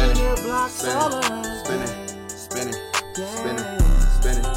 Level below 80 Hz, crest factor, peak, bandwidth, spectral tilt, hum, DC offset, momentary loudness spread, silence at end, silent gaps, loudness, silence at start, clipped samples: -22 dBFS; 14 dB; -6 dBFS; 16 kHz; -4 dB/octave; none; under 0.1%; 9 LU; 0 s; none; -24 LUFS; 0 s; under 0.1%